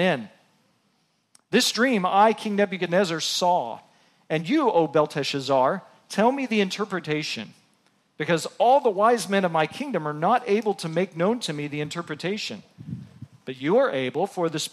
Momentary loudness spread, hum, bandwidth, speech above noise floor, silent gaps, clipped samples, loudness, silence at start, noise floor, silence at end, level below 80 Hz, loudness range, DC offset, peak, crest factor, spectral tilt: 13 LU; none; 15 kHz; 45 dB; none; under 0.1%; -24 LUFS; 0 s; -68 dBFS; 0.05 s; -74 dBFS; 4 LU; under 0.1%; -6 dBFS; 18 dB; -4.5 dB/octave